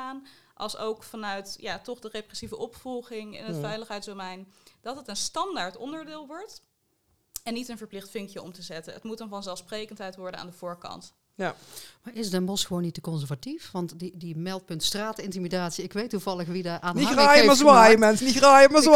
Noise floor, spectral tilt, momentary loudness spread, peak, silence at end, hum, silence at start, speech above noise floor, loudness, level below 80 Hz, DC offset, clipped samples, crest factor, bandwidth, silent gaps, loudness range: -71 dBFS; -3.5 dB/octave; 25 LU; 0 dBFS; 0 s; none; 0 s; 47 dB; -22 LUFS; -58 dBFS; under 0.1%; under 0.1%; 24 dB; 17 kHz; none; 19 LU